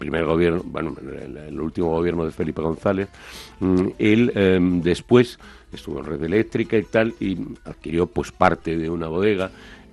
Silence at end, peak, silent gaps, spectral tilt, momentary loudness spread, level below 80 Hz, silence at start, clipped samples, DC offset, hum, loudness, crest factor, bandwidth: 0.1 s; 0 dBFS; none; -7 dB/octave; 16 LU; -46 dBFS; 0 s; under 0.1%; under 0.1%; none; -22 LUFS; 22 dB; 12.5 kHz